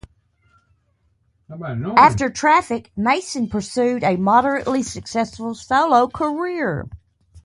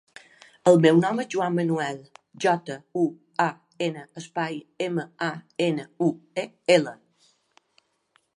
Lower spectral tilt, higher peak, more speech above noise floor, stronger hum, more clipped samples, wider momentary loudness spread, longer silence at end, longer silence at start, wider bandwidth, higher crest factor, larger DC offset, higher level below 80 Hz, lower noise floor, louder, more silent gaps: about the same, -5 dB/octave vs -6 dB/octave; first, 0 dBFS vs -4 dBFS; about the same, 45 dB vs 44 dB; neither; neither; about the same, 14 LU vs 13 LU; second, 0.05 s vs 1.4 s; first, 1.5 s vs 0.65 s; about the same, 11.5 kHz vs 11.5 kHz; about the same, 20 dB vs 22 dB; neither; first, -48 dBFS vs -74 dBFS; second, -64 dBFS vs -68 dBFS; first, -19 LUFS vs -25 LUFS; neither